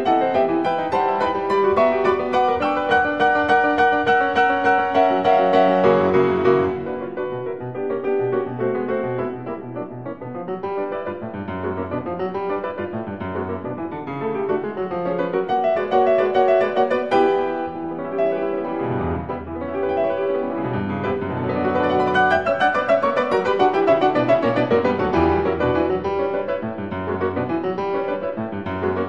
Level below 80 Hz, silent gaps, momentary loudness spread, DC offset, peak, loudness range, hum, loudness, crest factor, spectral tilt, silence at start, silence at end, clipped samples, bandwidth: -48 dBFS; none; 11 LU; 0.4%; -4 dBFS; 9 LU; none; -20 LUFS; 16 dB; -7.5 dB/octave; 0 s; 0 s; under 0.1%; 7.8 kHz